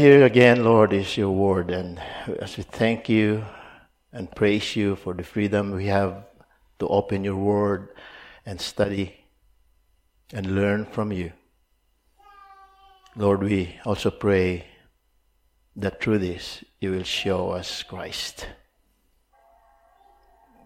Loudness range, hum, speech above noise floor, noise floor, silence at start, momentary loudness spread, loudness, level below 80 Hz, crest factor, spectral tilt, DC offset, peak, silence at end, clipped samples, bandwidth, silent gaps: 6 LU; none; 44 dB; -67 dBFS; 0 s; 18 LU; -23 LUFS; -54 dBFS; 24 dB; -6.5 dB/octave; under 0.1%; 0 dBFS; 2.1 s; under 0.1%; 14.5 kHz; none